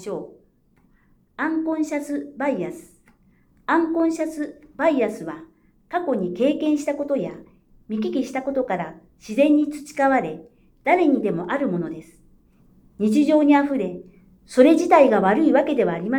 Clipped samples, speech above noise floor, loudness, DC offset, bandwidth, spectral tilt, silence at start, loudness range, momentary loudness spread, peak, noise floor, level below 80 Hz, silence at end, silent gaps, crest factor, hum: under 0.1%; 39 dB; -21 LUFS; under 0.1%; 12.5 kHz; -6.5 dB/octave; 0 s; 7 LU; 17 LU; -2 dBFS; -59 dBFS; -60 dBFS; 0 s; none; 20 dB; none